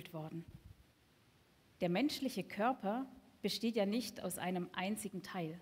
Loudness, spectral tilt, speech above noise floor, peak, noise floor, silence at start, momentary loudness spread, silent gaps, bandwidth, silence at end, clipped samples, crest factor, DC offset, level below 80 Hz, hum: -39 LUFS; -5 dB/octave; 31 dB; -22 dBFS; -70 dBFS; 0 s; 12 LU; none; 16 kHz; 0 s; under 0.1%; 18 dB; under 0.1%; -72 dBFS; none